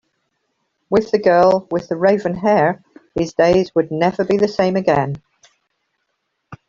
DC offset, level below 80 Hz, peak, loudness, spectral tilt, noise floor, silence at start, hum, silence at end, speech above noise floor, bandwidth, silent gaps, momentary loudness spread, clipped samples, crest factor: under 0.1%; -50 dBFS; -2 dBFS; -17 LUFS; -7 dB/octave; -72 dBFS; 0.9 s; none; 0.15 s; 56 dB; 7.4 kHz; none; 10 LU; under 0.1%; 16 dB